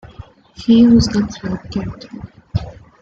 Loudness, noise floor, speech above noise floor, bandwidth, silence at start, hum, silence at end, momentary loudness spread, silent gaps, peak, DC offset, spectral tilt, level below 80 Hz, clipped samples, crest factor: -16 LUFS; -39 dBFS; 24 dB; 7.8 kHz; 0.05 s; none; 0.3 s; 24 LU; none; -2 dBFS; under 0.1%; -6.5 dB/octave; -36 dBFS; under 0.1%; 16 dB